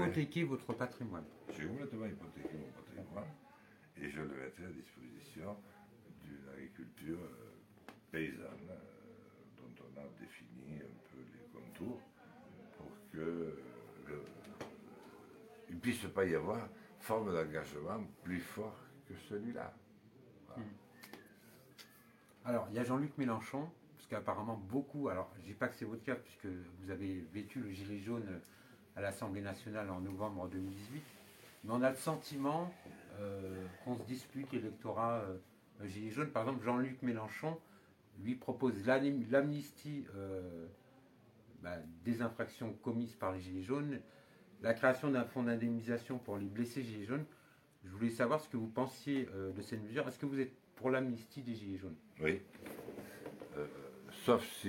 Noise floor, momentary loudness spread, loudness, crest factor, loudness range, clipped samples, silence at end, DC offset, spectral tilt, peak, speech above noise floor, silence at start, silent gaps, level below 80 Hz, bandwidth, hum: -66 dBFS; 20 LU; -42 LUFS; 24 dB; 12 LU; under 0.1%; 0 s; under 0.1%; -6.5 dB/octave; -18 dBFS; 26 dB; 0 s; none; -74 dBFS; 16.5 kHz; none